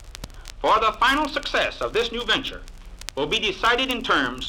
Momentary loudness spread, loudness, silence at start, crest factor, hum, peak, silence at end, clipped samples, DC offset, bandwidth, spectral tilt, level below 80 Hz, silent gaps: 18 LU; -22 LUFS; 0 s; 20 dB; none; -4 dBFS; 0 s; under 0.1%; under 0.1%; 18 kHz; -3 dB/octave; -40 dBFS; none